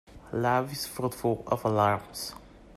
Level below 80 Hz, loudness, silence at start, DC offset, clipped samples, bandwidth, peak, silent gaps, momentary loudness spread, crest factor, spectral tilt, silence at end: -56 dBFS; -29 LUFS; 0.1 s; under 0.1%; under 0.1%; 16 kHz; -10 dBFS; none; 12 LU; 18 dB; -5.5 dB/octave; 0 s